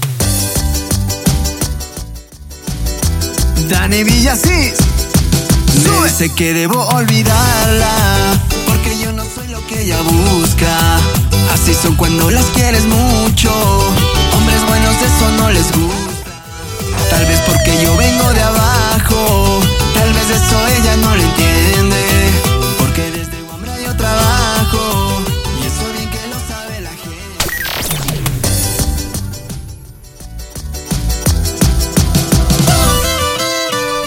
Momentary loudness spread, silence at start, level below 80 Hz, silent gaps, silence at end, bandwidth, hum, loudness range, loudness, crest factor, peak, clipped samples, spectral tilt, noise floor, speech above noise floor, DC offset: 13 LU; 0 s; -18 dBFS; none; 0 s; 17 kHz; none; 7 LU; -12 LUFS; 12 dB; 0 dBFS; under 0.1%; -4 dB/octave; -33 dBFS; 22 dB; under 0.1%